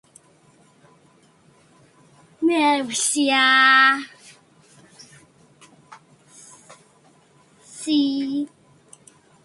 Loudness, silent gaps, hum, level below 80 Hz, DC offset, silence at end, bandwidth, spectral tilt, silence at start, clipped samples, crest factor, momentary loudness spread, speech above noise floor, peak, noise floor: -18 LUFS; none; none; -74 dBFS; under 0.1%; 0.95 s; 11.5 kHz; -1 dB/octave; 2.4 s; under 0.1%; 22 dB; 20 LU; 38 dB; -2 dBFS; -56 dBFS